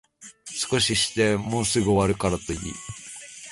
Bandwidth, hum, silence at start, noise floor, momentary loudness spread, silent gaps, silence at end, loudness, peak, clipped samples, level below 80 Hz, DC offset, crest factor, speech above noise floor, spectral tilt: 11.5 kHz; none; 0.2 s; -44 dBFS; 16 LU; none; 0 s; -23 LUFS; -8 dBFS; under 0.1%; -44 dBFS; under 0.1%; 16 dB; 21 dB; -4 dB/octave